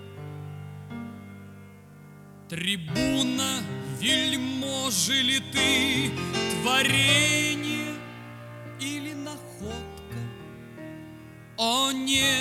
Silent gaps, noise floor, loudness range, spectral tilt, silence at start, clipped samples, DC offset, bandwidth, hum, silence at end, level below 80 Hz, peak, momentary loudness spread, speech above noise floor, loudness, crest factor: none; -48 dBFS; 13 LU; -2.5 dB/octave; 0 s; under 0.1%; under 0.1%; 19 kHz; none; 0 s; -56 dBFS; -8 dBFS; 21 LU; 23 dB; -24 LUFS; 20 dB